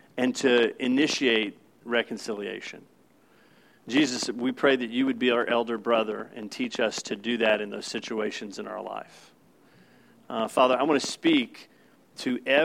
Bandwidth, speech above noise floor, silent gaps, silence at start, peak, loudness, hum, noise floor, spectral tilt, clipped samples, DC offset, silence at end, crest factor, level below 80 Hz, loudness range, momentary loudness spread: 14.5 kHz; 34 dB; none; 0.15 s; -6 dBFS; -26 LUFS; none; -60 dBFS; -3.5 dB/octave; under 0.1%; under 0.1%; 0 s; 22 dB; -80 dBFS; 4 LU; 13 LU